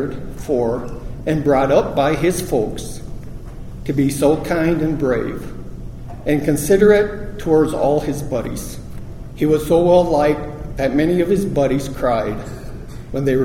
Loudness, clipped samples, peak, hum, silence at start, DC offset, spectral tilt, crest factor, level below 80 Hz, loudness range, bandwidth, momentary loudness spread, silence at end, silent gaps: -18 LUFS; under 0.1%; 0 dBFS; none; 0 s; under 0.1%; -6.5 dB/octave; 18 dB; -34 dBFS; 3 LU; 16.5 kHz; 20 LU; 0 s; none